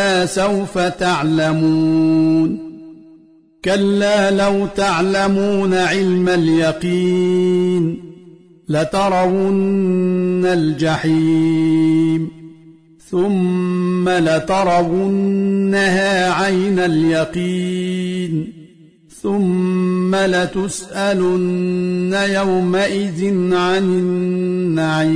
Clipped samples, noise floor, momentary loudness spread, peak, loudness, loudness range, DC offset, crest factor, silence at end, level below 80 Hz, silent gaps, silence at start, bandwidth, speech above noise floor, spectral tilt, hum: under 0.1%; -48 dBFS; 6 LU; -4 dBFS; -16 LUFS; 3 LU; 0.3%; 12 dB; 0 s; -48 dBFS; none; 0 s; 10.5 kHz; 32 dB; -6 dB/octave; none